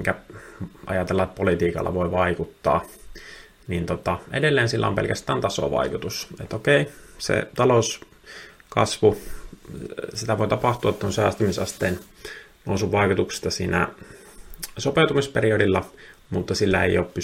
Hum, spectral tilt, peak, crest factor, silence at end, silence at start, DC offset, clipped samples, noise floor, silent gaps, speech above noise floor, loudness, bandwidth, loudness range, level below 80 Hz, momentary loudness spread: none; -5 dB/octave; -2 dBFS; 20 dB; 0 s; 0 s; under 0.1%; under 0.1%; -44 dBFS; none; 21 dB; -23 LUFS; 16.5 kHz; 2 LU; -48 dBFS; 19 LU